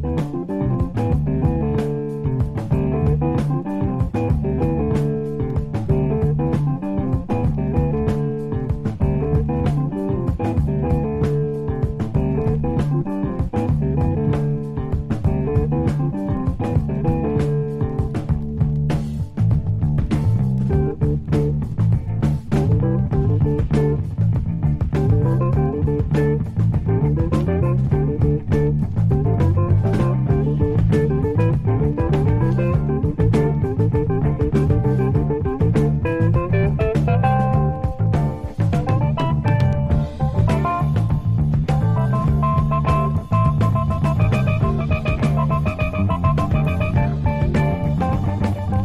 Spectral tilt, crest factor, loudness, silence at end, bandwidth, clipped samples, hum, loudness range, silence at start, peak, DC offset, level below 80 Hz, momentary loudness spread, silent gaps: -9.5 dB/octave; 14 dB; -20 LUFS; 0 s; 7.8 kHz; under 0.1%; none; 3 LU; 0 s; -4 dBFS; under 0.1%; -28 dBFS; 5 LU; none